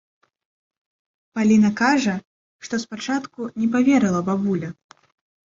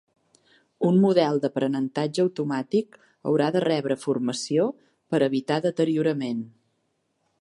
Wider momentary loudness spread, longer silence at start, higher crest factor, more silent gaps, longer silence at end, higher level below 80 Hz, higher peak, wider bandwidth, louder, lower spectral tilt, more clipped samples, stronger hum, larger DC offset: first, 15 LU vs 8 LU; first, 1.35 s vs 0.8 s; about the same, 16 dB vs 18 dB; first, 2.25-2.59 s vs none; about the same, 0.85 s vs 0.9 s; first, -62 dBFS vs -74 dBFS; about the same, -6 dBFS vs -8 dBFS; second, 7.6 kHz vs 11.5 kHz; first, -21 LUFS vs -24 LUFS; about the same, -5.5 dB/octave vs -6.5 dB/octave; neither; neither; neither